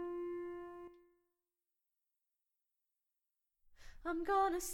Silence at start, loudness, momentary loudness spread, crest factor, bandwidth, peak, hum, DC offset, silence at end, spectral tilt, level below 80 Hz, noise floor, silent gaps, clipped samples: 0 s; -40 LUFS; 19 LU; 20 dB; 18 kHz; -24 dBFS; none; under 0.1%; 0 s; -3 dB/octave; -64 dBFS; under -90 dBFS; none; under 0.1%